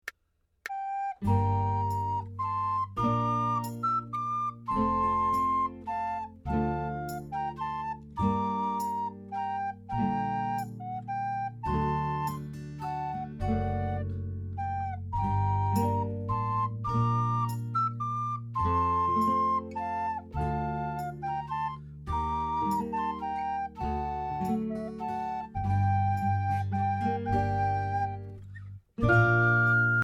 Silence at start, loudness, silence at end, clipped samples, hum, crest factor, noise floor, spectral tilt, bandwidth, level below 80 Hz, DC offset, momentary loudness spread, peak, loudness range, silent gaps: 0.05 s; -30 LUFS; 0 s; under 0.1%; none; 18 dB; -74 dBFS; -8 dB/octave; 18 kHz; -46 dBFS; under 0.1%; 9 LU; -12 dBFS; 4 LU; none